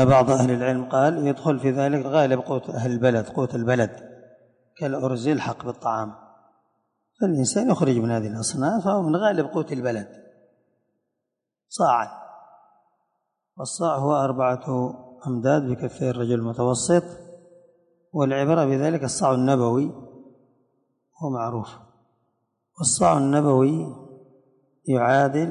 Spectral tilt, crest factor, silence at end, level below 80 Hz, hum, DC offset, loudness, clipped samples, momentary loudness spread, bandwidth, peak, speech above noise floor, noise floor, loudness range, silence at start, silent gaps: -6 dB/octave; 18 dB; 0 s; -58 dBFS; none; under 0.1%; -23 LUFS; under 0.1%; 13 LU; 11 kHz; -6 dBFS; 62 dB; -83 dBFS; 6 LU; 0 s; none